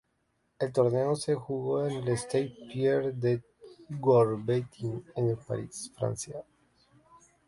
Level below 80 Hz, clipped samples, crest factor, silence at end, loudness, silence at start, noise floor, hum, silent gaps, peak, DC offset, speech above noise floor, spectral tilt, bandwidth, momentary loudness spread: -64 dBFS; under 0.1%; 18 dB; 1.05 s; -30 LUFS; 0.6 s; -75 dBFS; none; none; -12 dBFS; under 0.1%; 46 dB; -6.5 dB/octave; 11.5 kHz; 12 LU